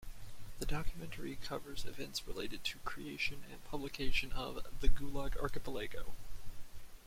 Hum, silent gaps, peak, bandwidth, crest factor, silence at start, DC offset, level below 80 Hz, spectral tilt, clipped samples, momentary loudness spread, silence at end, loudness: none; none; -14 dBFS; 16 kHz; 20 dB; 0 s; under 0.1%; -42 dBFS; -4 dB/octave; under 0.1%; 17 LU; 0.05 s; -42 LUFS